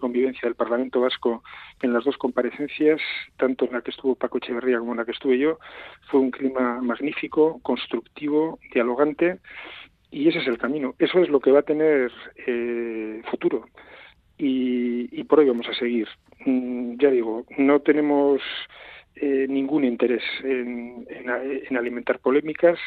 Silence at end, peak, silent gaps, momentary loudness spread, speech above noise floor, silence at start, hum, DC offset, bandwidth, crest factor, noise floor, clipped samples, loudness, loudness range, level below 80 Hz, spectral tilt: 0 s; -4 dBFS; none; 12 LU; 26 dB; 0 s; none; under 0.1%; 4.7 kHz; 20 dB; -49 dBFS; under 0.1%; -23 LUFS; 3 LU; -64 dBFS; -8 dB/octave